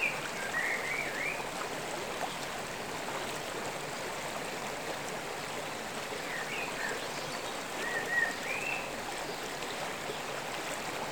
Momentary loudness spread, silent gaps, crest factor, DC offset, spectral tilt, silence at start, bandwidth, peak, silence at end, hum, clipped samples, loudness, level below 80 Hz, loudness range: 6 LU; none; 18 dB; 0.2%; -2 dB/octave; 0 s; over 20 kHz; -18 dBFS; 0 s; none; under 0.1%; -35 LUFS; -64 dBFS; 3 LU